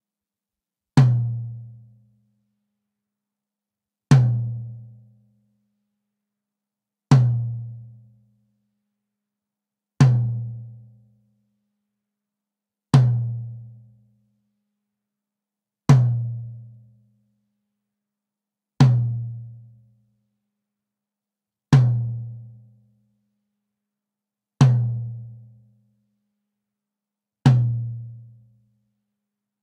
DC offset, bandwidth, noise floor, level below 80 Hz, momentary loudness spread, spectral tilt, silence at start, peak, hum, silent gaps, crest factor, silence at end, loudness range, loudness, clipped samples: under 0.1%; 9.2 kHz; -89 dBFS; -56 dBFS; 22 LU; -8 dB/octave; 0.95 s; -2 dBFS; none; none; 22 dB; 1.4 s; 1 LU; -20 LUFS; under 0.1%